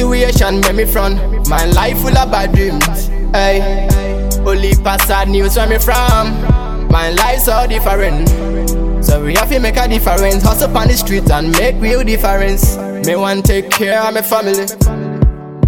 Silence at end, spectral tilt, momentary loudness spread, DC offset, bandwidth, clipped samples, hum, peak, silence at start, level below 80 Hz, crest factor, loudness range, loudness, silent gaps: 0 s; -5 dB/octave; 4 LU; under 0.1%; over 20 kHz; under 0.1%; none; 0 dBFS; 0 s; -14 dBFS; 10 dB; 1 LU; -13 LUFS; none